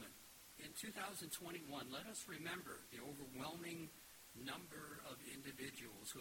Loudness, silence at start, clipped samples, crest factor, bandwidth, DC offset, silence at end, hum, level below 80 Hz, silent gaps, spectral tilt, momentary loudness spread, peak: -51 LUFS; 0 s; under 0.1%; 20 dB; 17.5 kHz; under 0.1%; 0 s; none; -78 dBFS; none; -3 dB/octave; 8 LU; -32 dBFS